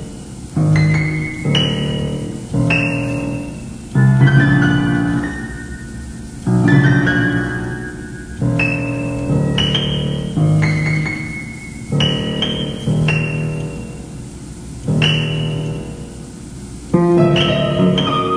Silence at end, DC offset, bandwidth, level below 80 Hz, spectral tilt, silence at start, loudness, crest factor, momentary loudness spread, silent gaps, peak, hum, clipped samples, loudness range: 0 s; under 0.1%; 10.5 kHz; -36 dBFS; -6.5 dB/octave; 0 s; -16 LUFS; 16 dB; 18 LU; none; 0 dBFS; none; under 0.1%; 4 LU